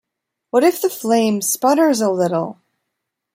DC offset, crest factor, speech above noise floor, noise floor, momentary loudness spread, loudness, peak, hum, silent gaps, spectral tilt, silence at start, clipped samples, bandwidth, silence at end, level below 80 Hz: under 0.1%; 16 dB; 62 dB; -78 dBFS; 7 LU; -17 LUFS; -2 dBFS; none; none; -4.5 dB/octave; 0.55 s; under 0.1%; 16.5 kHz; 0.85 s; -68 dBFS